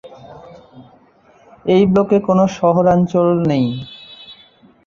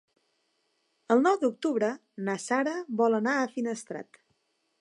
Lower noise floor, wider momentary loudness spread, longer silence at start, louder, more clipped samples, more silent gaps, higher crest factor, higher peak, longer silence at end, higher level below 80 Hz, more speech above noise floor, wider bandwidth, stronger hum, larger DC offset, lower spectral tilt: second, -50 dBFS vs -75 dBFS; first, 21 LU vs 11 LU; second, 0.05 s vs 1.1 s; first, -15 LUFS vs -28 LUFS; neither; neither; about the same, 16 dB vs 20 dB; first, -2 dBFS vs -10 dBFS; second, 0.55 s vs 0.8 s; first, -50 dBFS vs -84 dBFS; second, 36 dB vs 47 dB; second, 7 kHz vs 11.5 kHz; neither; neither; first, -8 dB/octave vs -5 dB/octave